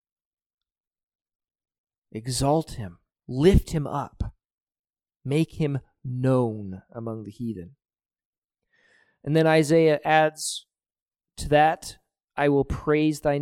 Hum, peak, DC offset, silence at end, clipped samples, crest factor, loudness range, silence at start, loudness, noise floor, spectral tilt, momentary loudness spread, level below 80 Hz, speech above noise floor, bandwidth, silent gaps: none; -6 dBFS; under 0.1%; 0 s; under 0.1%; 20 dB; 8 LU; 2.15 s; -24 LUFS; under -90 dBFS; -6 dB/octave; 18 LU; -40 dBFS; over 67 dB; 16 kHz; 4.54-4.67 s, 4.79-4.84 s, 8.25-8.49 s, 11.02-11.06 s, 12.24-12.28 s